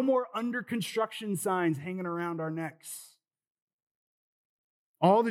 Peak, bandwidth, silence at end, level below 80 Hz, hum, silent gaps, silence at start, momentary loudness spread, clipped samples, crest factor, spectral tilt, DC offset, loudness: -10 dBFS; 16.5 kHz; 0 s; under -90 dBFS; none; 3.47-3.55 s, 3.62-4.94 s; 0 s; 12 LU; under 0.1%; 22 dB; -5.5 dB/octave; under 0.1%; -31 LUFS